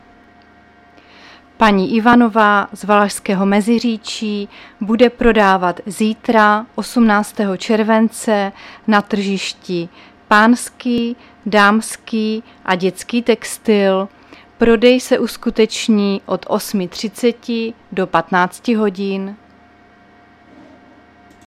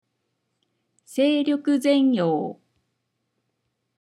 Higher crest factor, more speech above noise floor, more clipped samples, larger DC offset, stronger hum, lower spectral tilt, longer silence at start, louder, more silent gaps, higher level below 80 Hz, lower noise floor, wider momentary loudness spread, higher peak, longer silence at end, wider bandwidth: about the same, 16 dB vs 16 dB; second, 32 dB vs 56 dB; neither; neither; neither; about the same, -5 dB/octave vs -6 dB/octave; first, 1.6 s vs 1.1 s; first, -15 LUFS vs -22 LUFS; neither; first, -42 dBFS vs -86 dBFS; second, -47 dBFS vs -76 dBFS; about the same, 11 LU vs 10 LU; first, 0 dBFS vs -8 dBFS; first, 2.1 s vs 1.5 s; first, 14.5 kHz vs 13 kHz